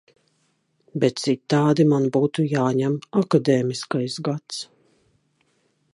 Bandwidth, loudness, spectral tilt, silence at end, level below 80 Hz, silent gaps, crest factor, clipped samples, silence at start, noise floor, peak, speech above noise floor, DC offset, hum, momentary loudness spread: 11.5 kHz; -22 LUFS; -6.5 dB/octave; 1.3 s; -68 dBFS; none; 18 dB; under 0.1%; 0.95 s; -68 dBFS; -6 dBFS; 47 dB; under 0.1%; none; 12 LU